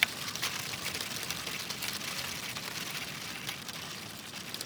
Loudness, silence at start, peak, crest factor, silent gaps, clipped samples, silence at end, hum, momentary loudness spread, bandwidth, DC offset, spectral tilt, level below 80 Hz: -35 LUFS; 0 s; -6 dBFS; 32 dB; none; under 0.1%; 0 s; none; 6 LU; over 20 kHz; under 0.1%; -1 dB/octave; -68 dBFS